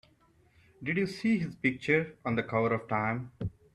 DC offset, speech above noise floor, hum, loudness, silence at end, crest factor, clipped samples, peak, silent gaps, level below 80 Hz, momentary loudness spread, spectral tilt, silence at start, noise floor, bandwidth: under 0.1%; 35 dB; none; -31 LUFS; 0.25 s; 18 dB; under 0.1%; -14 dBFS; none; -60 dBFS; 8 LU; -7.5 dB/octave; 0.8 s; -65 dBFS; 11.5 kHz